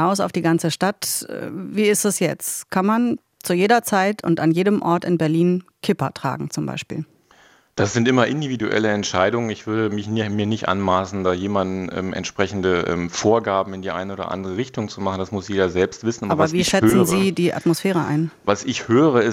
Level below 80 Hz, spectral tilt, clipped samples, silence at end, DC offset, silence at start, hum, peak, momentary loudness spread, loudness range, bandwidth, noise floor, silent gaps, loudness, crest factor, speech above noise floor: -56 dBFS; -5 dB/octave; under 0.1%; 0 s; under 0.1%; 0 s; none; -2 dBFS; 9 LU; 4 LU; 16.5 kHz; -53 dBFS; none; -20 LUFS; 18 dB; 33 dB